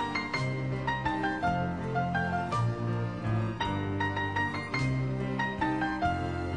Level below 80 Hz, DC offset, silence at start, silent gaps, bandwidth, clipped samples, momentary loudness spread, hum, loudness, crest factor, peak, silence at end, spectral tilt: -50 dBFS; 0.2%; 0 s; none; 10 kHz; under 0.1%; 2 LU; none; -31 LUFS; 14 dB; -16 dBFS; 0 s; -7 dB/octave